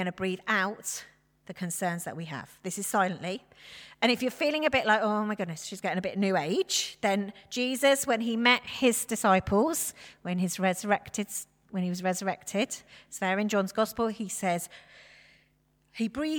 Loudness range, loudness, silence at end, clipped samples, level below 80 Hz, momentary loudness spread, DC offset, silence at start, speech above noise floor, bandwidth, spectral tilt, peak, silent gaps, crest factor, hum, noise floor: 6 LU; -29 LUFS; 0 s; under 0.1%; -62 dBFS; 14 LU; under 0.1%; 0 s; 40 dB; 20 kHz; -3.5 dB/octave; -8 dBFS; none; 22 dB; none; -69 dBFS